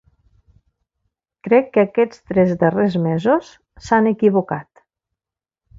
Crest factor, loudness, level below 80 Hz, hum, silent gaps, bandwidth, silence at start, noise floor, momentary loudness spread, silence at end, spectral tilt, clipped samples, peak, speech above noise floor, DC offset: 18 dB; -17 LUFS; -54 dBFS; none; none; 7.6 kHz; 1.45 s; -89 dBFS; 10 LU; 1.15 s; -8 dB/octave; under 0.1%; -2 dBFS; 72 dB; under 0.1%